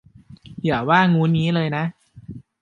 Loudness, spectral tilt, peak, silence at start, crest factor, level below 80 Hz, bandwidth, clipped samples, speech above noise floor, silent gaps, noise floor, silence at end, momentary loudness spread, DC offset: -19 LUFS; -8 dB/octave; -2 dBFS; 0.3 s; 18 dB; -54 dBFS; 7.2 kHz; under 0.1%; 26 dB; none; -44 dBFS; 0.2 s; 24 LU; under 0.1%